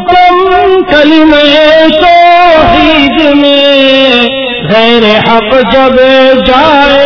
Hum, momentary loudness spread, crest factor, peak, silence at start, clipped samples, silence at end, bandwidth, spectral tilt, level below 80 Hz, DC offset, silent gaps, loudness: none; 3 LU; 4 dB; 0 dBFS; 0 s; 10%; 0 s; 5.4 kHz; -5.5 dB/octave; -28 dBFS; under 0.1%; none; -4 LUFS